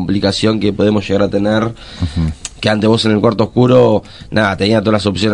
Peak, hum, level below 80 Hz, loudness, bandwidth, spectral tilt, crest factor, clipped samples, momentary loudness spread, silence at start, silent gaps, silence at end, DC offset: 0 dBFS; none; -36 dBFS; -14 LUFS; 11 kHz; -6 dB/octave; 14 dB; under 0.1%; 9 LU; 0 s; none; 0 s; under 0.1%